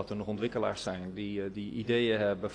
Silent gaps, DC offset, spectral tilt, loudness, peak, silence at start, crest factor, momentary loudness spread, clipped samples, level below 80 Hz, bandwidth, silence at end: none; under 0.1%; -6 dB/octave; -33 LUFS; -16 dBFS; 0 s; 16 dB; 9 LU; under 0.1%; -60 dBFS; 10.5 kHz; 0 s